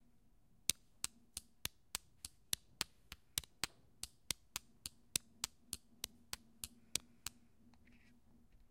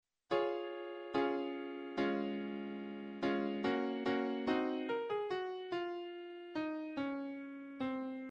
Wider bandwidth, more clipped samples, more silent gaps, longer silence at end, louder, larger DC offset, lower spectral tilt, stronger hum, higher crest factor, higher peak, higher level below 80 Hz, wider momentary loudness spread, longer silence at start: first, 16.5 kHz vs 7.4 kHz; neither; neither; about the same, 0.05 s vs 0 s; second, -46 LUFS vs -39 LUFS; neither; second, 0 dB/octave vs -6.5 dB/octave; neither; first, 42 dB vs 18 dB; first, -8 dBFS vs -20 dBFS; first, -68 dBFS vs -76 dBFS; first, 12 LU vs 9 LU; first, 0.7 s vs 0.3 s